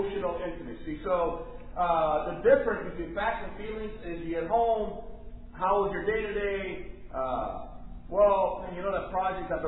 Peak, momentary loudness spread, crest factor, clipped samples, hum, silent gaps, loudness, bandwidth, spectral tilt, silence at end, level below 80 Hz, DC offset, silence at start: -10 dBFS; 16 LU; 20 dB; under 0.1%; none; none; -29 LUFS; 4.1 kHz; -9.5 dB/octave; 0 s; -44 dBFS; under 0.1%; 0 s